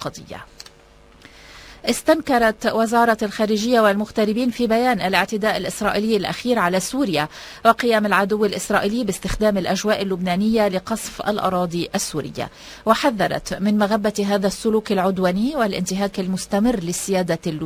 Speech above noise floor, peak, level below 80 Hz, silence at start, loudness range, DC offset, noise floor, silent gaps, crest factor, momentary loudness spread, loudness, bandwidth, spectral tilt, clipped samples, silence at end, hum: 29 dB; 0 dBFS; -46 dBFS; 0 s; 3 LU; under 0.1%; -49 dBFS; none; 20 dB; 7 LU; -20 LUFS; 16 kHz; -4.5 dB/octave; under 0.1%; 0 s; none